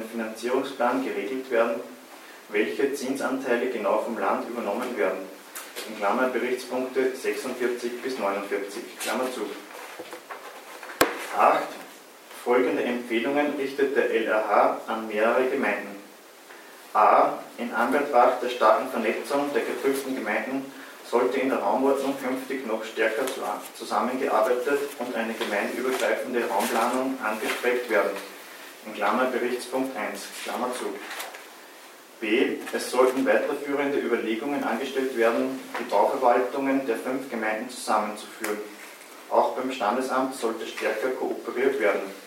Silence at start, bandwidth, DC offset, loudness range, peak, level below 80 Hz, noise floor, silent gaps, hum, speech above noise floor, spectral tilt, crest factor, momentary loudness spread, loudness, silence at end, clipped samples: 0 s; 16.5 kHz; under 0.1%; 5 LU; -2 dBFS; -76 dBFS; -48 dBFS; none; none; 22 dB; -3.5 dB/octave; 26 dB; 17 LU; -26 LUFS; 0 s; under 0.1%